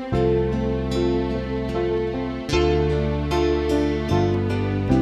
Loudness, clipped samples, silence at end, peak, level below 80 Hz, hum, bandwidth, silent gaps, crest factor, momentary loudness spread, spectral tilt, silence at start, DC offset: -22 LUFS; under 0.1%; 0 s; -6 dBFS; -32 dBFS; none; 12.5 kHz; none; 16 dB; 4 LU; -7.5 dB/octave; 0 s; under 0.1%